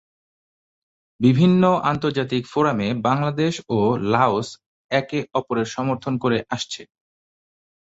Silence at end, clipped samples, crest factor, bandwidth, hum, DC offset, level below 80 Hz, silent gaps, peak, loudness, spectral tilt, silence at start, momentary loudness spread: 1.1 s; under 0.1%; 20 dB; 8 kHz; none; under 0.1%; -56 dBFS; 4.66-4.89 s; -2 dBFS; -21 LUFS; -6.5 dB/octave; 1.2 s; 9 LU